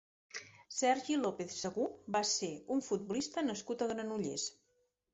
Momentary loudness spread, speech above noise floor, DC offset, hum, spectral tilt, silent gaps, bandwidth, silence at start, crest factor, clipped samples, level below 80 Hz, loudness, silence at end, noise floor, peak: 10 LU; 42 dB; under 0.1%; none; -3 dB/octave; none; 8.2 kHz; 0.35 s; 18 dB; under 0.1%; -74 dBFS; -37 LUFS; 0.6 s; -79 dBFS; -20 dBFS